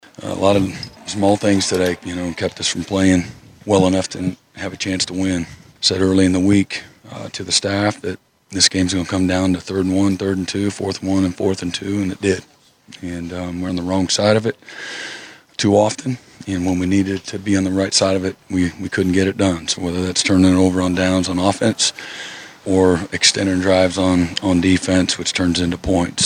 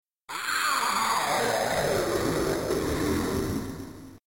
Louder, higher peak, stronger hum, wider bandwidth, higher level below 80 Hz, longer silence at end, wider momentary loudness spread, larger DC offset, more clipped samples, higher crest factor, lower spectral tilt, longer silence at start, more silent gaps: first, -18 LUFS vs -27 LUFS; first, 0 dBFS vs -14 dBFS; neither; second, 13.5 kHz vs 17 kHz; about the same, -46 dBFS vs -46 dBFS; about the same, 0 s vs 0.1 s; first, 14 LU vs 10 LU; second, under 0.1% vs 0.1%; neither; about the same, 18 dB vs 14 dB; about the same, -4.5 dB/octave vs -3.5 dB/octave; about the same, 0.2 s vs 0.3 s; neither